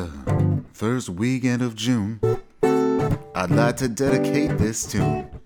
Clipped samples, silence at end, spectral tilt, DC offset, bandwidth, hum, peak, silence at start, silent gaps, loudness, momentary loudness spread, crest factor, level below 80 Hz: under 0.1%; 0 s; -6 dB/octave; under 0.1%; 19 kHz; none; -4 dBFS; 0 s; none; -22 LUFS; 5 LU; 18 dB; -42 dBFS